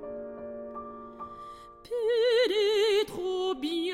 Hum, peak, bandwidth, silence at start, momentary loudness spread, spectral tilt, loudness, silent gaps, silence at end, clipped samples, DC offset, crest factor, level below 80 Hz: none; -16 dBFS; 14 kHz; 0 s; 19 LU; -3 dB/octave; -27 LUFS; none; 0 s; under 0.1%; under 0.1%; 12 dB; -62 dBFS